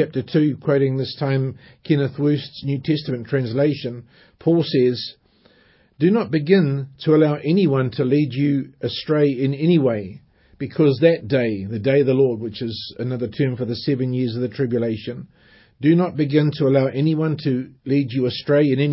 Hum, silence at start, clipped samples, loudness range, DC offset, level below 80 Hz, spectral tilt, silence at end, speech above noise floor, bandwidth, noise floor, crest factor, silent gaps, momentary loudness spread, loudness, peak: none; 0 s; under 0.1%; 4 LU; under 0.1%; -56 dBFS; -12 dB/octave; 0 s; 37 dB; 5.8 kHz; -56 dBFS; 18 dB; none; 10 LU; -20 LUFS; -2 dBFS